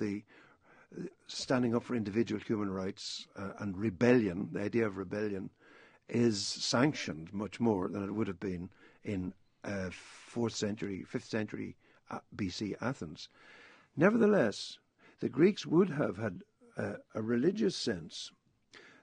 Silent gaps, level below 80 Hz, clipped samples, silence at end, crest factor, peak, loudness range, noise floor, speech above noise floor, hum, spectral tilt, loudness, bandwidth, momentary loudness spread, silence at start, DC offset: none; -70 dBFS; under 0.1%; 0.15 s; 22 dB; -12 dBFS; 8 LU; -62 dBFS; 29 dB; none; -5.5 dB/octave; -34 LUFS; 10 kHz; 17 LU; 0 s; under 0.1%